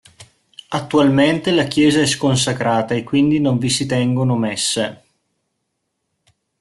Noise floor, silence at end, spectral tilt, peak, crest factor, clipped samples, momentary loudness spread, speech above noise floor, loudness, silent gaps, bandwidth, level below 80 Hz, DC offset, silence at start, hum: -73 dBFS; 1.65 s; -5 dB/octave; -2 dBFS; 16 dB; under 0.1%; 5 LU; 57 dB; -17 LUFS; none; 12 kHz; -52 dBFS; under 0.1%; 0.2 s; none